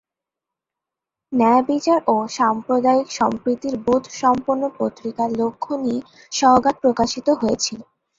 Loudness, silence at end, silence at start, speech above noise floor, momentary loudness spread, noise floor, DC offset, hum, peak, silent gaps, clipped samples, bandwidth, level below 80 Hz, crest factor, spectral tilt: -19 LUFS; 0.35 s; 1.3 s; 67 dB; 9 LU; -86 dBFS; under 0.1%; none; -2 dBFS; none; under 0.1%; 7.8 kHz; -54 dBFS; 18 dB; -4 dB/octave